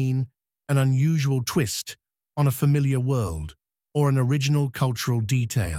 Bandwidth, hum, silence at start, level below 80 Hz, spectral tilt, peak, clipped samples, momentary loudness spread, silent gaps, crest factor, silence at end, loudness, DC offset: 16 kHz; none; 0 s; -46 dBFS; -6 dB/octave; -10 dBFS; under 0.1%; 10 LU; none; 14 dB; 0 s; -24 LUFS; under 0.1%